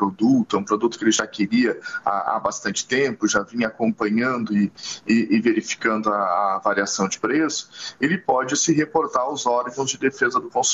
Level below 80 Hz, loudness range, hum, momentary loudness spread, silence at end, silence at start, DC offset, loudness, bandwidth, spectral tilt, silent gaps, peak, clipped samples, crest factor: -62 dBFS; 1 LU; none; 5 LU; 0 s; 0 s; under 0.1%; -21 LUFS; 8.2 kHz; -3.5 dB/octave; none; -4 dBFS; under 0.1%; 16 dB